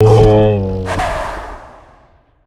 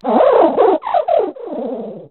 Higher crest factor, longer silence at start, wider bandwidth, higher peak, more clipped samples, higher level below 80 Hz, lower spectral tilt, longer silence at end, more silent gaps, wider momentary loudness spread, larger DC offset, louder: about the same, 14 dB vs 14 dB; about the same, 0 s vs 0.05 s; first, 11 kHz vs 4.3 kHz; about the same, 0 dBFS vs 0 dBFS; neither; first, -26 dBFS vs -58 dBFS; first, -7.5 dB/octave vs -4 dB/octave; first, 0.8 s vs 0.05 s; neither; first, 21 LU vs 14 LU; neither; about the same, -13 LUFS vs -14 LUFS